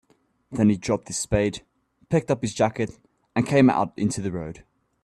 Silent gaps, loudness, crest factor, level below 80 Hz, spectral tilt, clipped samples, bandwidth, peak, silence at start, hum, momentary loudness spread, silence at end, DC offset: none; -24 LUFS; 20 dB; -48 dBFS; -6 dB/octave; under 0.1%; 12.5 kHz; -4 dBFS; 0.5 s; none; 13 LU; 0.45 s; under 0.1%